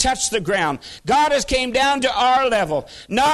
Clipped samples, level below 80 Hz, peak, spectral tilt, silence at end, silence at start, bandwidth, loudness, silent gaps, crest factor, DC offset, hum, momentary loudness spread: under 0.1%; -40 dBFS; -4 dBFS; -2.5 dB/octave; 0 s; 0 s; 12.5 kHz; -18 LUFS; none; 16 dB; under 0.1%; none; 7 LU